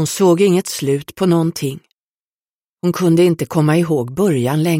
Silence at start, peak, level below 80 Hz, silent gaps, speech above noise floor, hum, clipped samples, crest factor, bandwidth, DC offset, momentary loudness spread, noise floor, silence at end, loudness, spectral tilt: 0 s; -2 dBFS; -56 dBFS; 1.94-2.77 s; over 75 dB; none; under 0.1%; 14 dB; 16.5 kHz; under 0.1%; 9 LU; under -90 dBFS; 0 s; -16 LUFS; -6 dB/octave